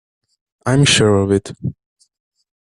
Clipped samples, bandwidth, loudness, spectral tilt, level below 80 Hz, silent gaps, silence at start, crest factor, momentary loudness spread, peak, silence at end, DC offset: under 0.1%; 12 kHz; -15 LUFS; -4.5 dB/octave; -48 dBFS; none; 0.65 s; 18 dB; 16 LU; 0 dBFS; 0.9 s; under 0.1%